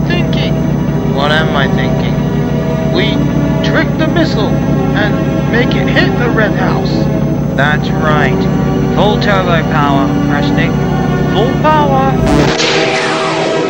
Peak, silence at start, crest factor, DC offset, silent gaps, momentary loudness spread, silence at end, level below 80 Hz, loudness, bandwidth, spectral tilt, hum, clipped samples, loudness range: 0 dBFS; 0 s; 10 dB; under 0.1%; none; 3 LU; 0 s; -26 dBFS; -11 LUFS; 16.5 kHz; -6.5 dB/octave; none; under 0.1%; 1 LU